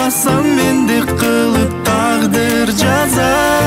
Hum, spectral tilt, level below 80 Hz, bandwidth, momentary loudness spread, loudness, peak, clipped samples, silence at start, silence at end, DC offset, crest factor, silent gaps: none; -4.5 dB/octave; -34 dBFS; 16.5 kHz; 2 LU; -13 LUFS; -2 dBFS; under 0.1%; 0 s; 0 s; under 0.1%; 12 dB; none